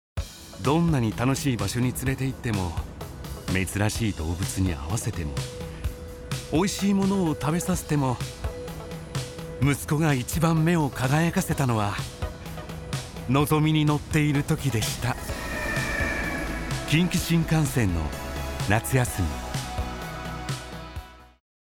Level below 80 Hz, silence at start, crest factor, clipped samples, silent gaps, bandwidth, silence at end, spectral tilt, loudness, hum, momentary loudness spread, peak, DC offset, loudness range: -38 dBFS; 0.15 s; 18 dB; under 0.1%; none; 19 kHz; 0.5 s; -5.5 dB/octave; -26 LUFS; none; 12 LU; -8 dBFS; under 0.1%; 4 LU